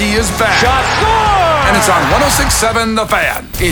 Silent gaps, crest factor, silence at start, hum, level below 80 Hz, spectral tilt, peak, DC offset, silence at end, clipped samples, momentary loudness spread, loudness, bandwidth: none; 12 dB; 0 s; none; -24 dBFS; -3 dB/octave; 0 dBFS; under 0.1%; 0 s; under 0.1%; 3 LU; -11 LUFS; over 20 kHz